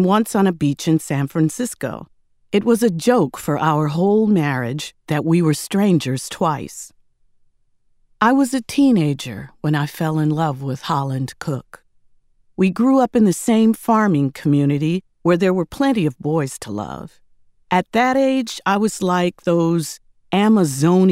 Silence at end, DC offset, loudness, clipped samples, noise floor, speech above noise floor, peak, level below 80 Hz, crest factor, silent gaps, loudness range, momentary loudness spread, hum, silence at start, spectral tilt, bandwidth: 0 s; under 0.1%; -18 LUFS; under 0.1%; -59 dBFS; 41 dB; 0 dBFS; -54 dBFS; 18 dB; none; 4 LU; 11 LU; none; 0 s; -6 dB/octave; 16 kHz